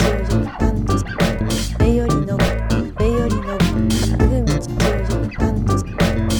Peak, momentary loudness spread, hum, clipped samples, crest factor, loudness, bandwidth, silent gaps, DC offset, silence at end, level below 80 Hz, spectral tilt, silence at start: -2 dBFS; 4 LU; none; under 0.1%; 16 dB; -19 LUFS; 19 kHz; none; under 0.1%; 0 s; -24 dBFS; -6 dB/octave; 0 s